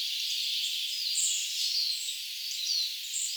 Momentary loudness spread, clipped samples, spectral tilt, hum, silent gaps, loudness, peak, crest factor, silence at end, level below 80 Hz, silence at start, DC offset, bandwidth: 5 LU; under 0.1%; 13.5 dB/octave; none; none; -29 LUFS; -16 dBFS; 16 dB; 0 s; under -90 dBFS; 0 s; under 0.1%; over 20 kHz